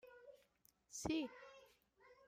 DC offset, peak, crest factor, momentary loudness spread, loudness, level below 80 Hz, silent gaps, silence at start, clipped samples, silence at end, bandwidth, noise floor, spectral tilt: under 0.1%; -28 dBFS; 22 dB; 22 LU; -46 LUFS; -70 dBFS; none; 0.05 s; under 0.1%; 0.15 s; 16 kHz; -77 dBFS; -4 dB/octave